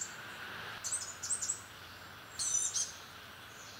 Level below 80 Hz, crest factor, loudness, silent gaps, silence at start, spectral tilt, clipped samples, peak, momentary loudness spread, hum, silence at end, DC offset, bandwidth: -74 dBFS; 20 dB; -36 LUFS; none; 0 s; 0.5 dB/octave; under 0.1%; -20 dBFS; 18 LU; none; 0 s; under 0.1%; 16 kHz